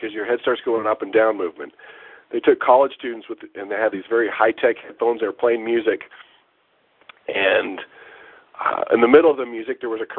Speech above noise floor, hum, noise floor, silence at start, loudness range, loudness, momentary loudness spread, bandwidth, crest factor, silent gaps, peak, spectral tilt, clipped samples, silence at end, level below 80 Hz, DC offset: 43 dB; none; -63 dBFS; 0 s; 4 LU; -20 LUFS; 18 LU; 4.1 kHz; 20 dB; none; 0 dBFS; -8.5 dB/octave; under 0.1%; 0 s; -66 dBFS; under 0.1%